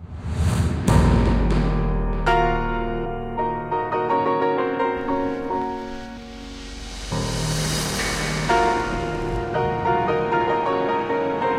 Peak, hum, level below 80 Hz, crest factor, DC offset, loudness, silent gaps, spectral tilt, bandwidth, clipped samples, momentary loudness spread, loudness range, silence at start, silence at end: -4 dBFS; none; -30 dBFS; 18 dB; under 0.1%; -22 LUFS; none; -5.5 dB/octave; 16 kHz; under 0.1%; 11 LU; 5 LU; 0 s; 0 s